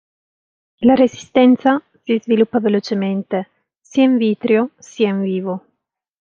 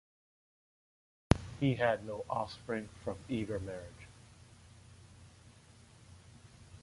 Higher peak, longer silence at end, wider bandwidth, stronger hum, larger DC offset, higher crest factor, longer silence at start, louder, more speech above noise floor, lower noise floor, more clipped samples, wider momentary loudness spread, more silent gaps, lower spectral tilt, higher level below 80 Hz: first, -2 dBFS vs -8 dBFS; first, 0.65 s vs 0 s; second, 7.2 kHz vs 11.5 kHz; neither; neither; second, 16 dB vs 32 dB; second, 0.8 s vs 1.3 s; first, -17 LUFS vs -36 LUFS; first, 60 dB vs 23 dB; first, -76 dBFS vs -60 dBFS; neither; second, 11 LU vs 26 LU; neither; about the same, -6.5 dB/octave vs -6.5 dB/octave; second, -60 dBFS vs -52 dBFS